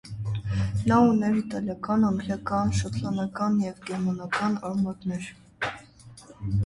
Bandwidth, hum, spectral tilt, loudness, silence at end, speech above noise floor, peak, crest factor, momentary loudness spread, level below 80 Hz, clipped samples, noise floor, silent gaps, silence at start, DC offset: 11.5 kHz; none; -7 dB/octave; -27 LUFS; 0 s; 24 dB; -10 dBFS; 16 dB; 12 LU; -46 dBFS; under 0.1%; -49 dBFS; none; 0.05 s; under 0.1%